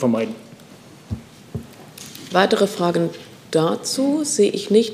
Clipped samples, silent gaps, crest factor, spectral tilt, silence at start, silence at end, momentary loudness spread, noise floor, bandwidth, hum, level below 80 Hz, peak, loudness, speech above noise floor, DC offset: under 0.1%; none; 20 dB; -4.5 dB/octave; 0 s; 0 s; 19 LU; -44 dBFS; 15.5 kHz; none; -52 dBFS; 0 dBFS; -20 LUFS; 25 dB; under 0.1%